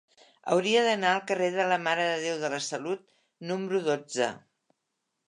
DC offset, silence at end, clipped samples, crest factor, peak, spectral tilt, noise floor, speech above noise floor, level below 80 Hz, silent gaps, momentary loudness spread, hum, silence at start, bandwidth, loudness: under 0.1%; 0.9 s; under 0.1%; 20 dB; -10 dBFS; -3.5 dB/octave; -82 dBFS; 54 dB; -82 dBFS; none; 11 LU; none; 0.45 s; 11 kHz; -28 LUFS